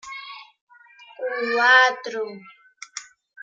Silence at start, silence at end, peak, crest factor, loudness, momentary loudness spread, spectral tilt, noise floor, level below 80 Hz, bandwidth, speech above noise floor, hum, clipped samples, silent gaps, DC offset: 0.05 s; 0.4 s; -4 dBFS; 22 dB; -19 LUFS; 23 LU; -1 dB/octave; -50 dBFS; -80 dBFS; 9.2 kHz; 30 dB; none; under 0.1%; 0.61-0.67 s; under 0.1%